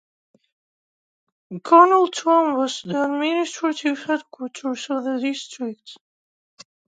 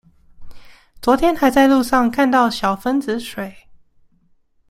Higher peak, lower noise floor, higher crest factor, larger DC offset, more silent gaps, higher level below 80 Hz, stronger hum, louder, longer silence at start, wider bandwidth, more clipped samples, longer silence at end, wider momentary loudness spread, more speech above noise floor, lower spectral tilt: about the same, 0 dBFS vs -2 dBFS; first, under -90 dBFS vs -57 dBFS; first, 22 dB vs 16 dB; neither; neither; second, -80 dBFS vs -44 dBFS; neither; second, -20 LUFS vs -16 LUFS; first, 1.5 s vs 0.4 s; second, 9.4 kHz vs 16 kHz; neither; second, 0.95 s vs 1.1 s; first, 17 LU vs 12 LU; first, over 70 dB vs 41 dB; about the same, -4 dB/octave vs -4.5 dB/octave